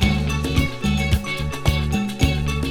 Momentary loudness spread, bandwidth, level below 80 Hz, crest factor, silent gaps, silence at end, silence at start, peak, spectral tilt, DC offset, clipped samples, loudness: 3 LU; 18 kHz; -26 dBFS; 16 dB; none; 0 s; 0 s; -4 dBFS; -5.5 dB/octave; under 0.1%; under 0.1%; -22 LUFS